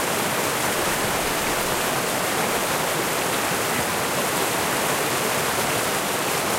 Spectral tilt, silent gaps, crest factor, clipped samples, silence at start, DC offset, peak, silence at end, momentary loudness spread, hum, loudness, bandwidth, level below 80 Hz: -2 dB/octave; none; 14 dB; under 0.1%; 0 s; under 0.1%; -8 dBFS; 0 s; 1 LU; none; -22 LUFS; 16 kHz; -48 dBFS